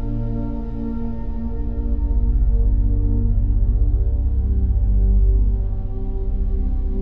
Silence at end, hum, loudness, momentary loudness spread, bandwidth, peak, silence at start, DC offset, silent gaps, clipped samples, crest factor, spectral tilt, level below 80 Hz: 0 s; none; -22 LUFS; 8 LU; 1.8 kHz; -6 dBFS; 0 s; 2%; none; under 0.1%; 10 dB; -13 dB/octave; -18 dBFS